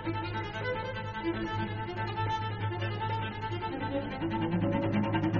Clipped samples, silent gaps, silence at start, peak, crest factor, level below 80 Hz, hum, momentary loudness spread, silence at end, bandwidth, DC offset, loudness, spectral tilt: under 0.1%; none; 0 s; -16 dBFS; 16 dB; -52 dBFS; none; 6 LU; 0 s; 6.8 kHz; under 0.1%; -33 LUFS; -5.5 dB/octave